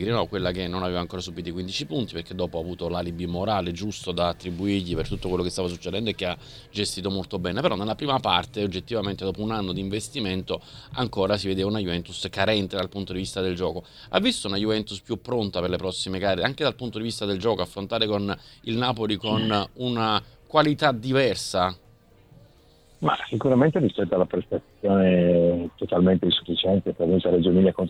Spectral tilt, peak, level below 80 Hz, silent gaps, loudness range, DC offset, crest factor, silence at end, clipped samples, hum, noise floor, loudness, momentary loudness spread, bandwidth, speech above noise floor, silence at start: -5.5 dB/octave; -4 dBFS; -48 dBFS; none; 6 LU; under 0.1%; 20 dB; 0 s; under 0.1%; none; -55 dBFS; -25 LUFS; 10 LU; 14 kHz; 30 dB; 0 s